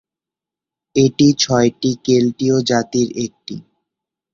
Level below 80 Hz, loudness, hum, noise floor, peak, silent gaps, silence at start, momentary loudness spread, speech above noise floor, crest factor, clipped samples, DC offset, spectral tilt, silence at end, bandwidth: -54 dBFS; -16 LUFS; none; -87 dBFS; -2 dBFS; none; 0.95 s; 14 LU; 72 dB; 16 dB; under 0.1%; under 0.1%; -5 dB/octave; 0.75 s; 7.4 kHz